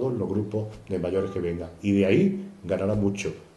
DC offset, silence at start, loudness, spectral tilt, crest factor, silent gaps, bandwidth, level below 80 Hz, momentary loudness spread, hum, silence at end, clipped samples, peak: under 0.1%; 0 s; -26 LUFS; -7.5 dB/octave; 18 dB; none; 11 kHz; -52 dBFS; 11 LU; none; 0.1 s; under 0.1%; -8 dBFS